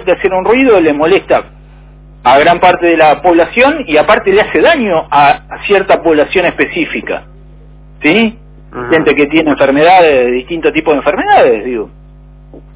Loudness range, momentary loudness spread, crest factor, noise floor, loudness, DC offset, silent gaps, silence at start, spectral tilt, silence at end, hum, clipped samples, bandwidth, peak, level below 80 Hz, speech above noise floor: 4 LU; 8 LU; 10 dB; -35 dBFS; -9 LUFS; under 0.1%; none; 0 s; -9 dB/octave; 0.15 s; 50 Hz at -35 dBFS; 0.6%; 4 kHz; 0 dBFS; -36 dBFS; 27 dB